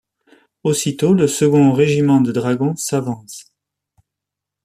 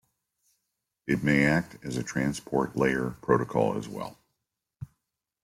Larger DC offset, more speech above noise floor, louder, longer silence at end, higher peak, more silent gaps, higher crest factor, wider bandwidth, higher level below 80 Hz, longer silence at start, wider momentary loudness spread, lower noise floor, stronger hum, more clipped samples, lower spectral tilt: neither; first, 68 dB vs 57 dB; first, -16 LUFS vs -27 LUFS; first, 1.25 s vs 0.6 s; first, -2 dBFS vs -8 dBFS; neither; second, 14 dB vs 20 dB; about the same, 15 kHz vs 16 kHz; about the same, -58 dBFS vs -56 dBFS; second, 0.65 s vs 1.05 s; second, 14 LU vs 20 LU; about the same, -83 dBFS vs -84 dBFS; neither; neither; about the same, -6 dB/octave vs -6 dB/octave